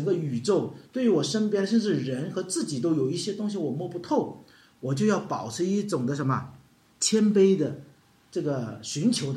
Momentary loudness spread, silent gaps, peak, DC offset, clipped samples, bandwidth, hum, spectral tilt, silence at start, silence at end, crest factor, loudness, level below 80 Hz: 10 LU; none; -10 dBFS; under 0.1%; under 0.1%; 13.5 kHz; none; -5.5 dB/octave; 0 s; 0 s; 16 dB; -27 LUFS; -70 dBFS